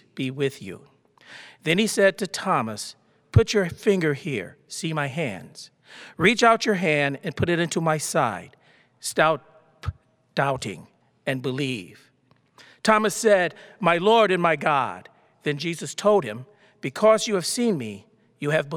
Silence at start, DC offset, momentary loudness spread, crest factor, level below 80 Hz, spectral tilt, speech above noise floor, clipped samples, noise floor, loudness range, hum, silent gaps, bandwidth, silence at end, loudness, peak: 0.15 s; under 0.1%; 17 LU; 22 dB; -50 dBFS; -4.5 dB/octave; 40 dB; under 0.1%; -63 dBFS; 6 LU; none; none; 19 kHz; 0 s; -23 LUFS; -2 dBFS